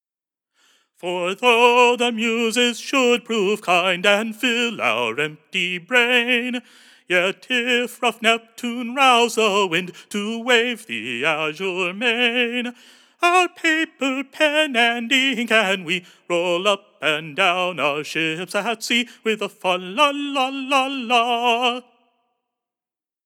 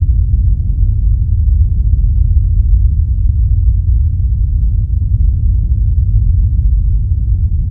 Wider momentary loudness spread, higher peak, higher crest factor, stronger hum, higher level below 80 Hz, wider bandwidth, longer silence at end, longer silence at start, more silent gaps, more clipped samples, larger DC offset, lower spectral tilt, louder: first, 9 LU vs 2 LU; about the same, -2 dBFS vs 0 dBFS; first, 20 dB vs 10 dB; neither; second, under -90 dBFS vs -12 dBFS; first, 18 kHz vs 0.6 kHz; first, 1.45 s vs 0 s; first, 1.05 s vs 0 s; neither; neither; neither; second, -2.5 dB/octave vs -13.5 dB/octave; second, -19 LUFS vs -14 LUFS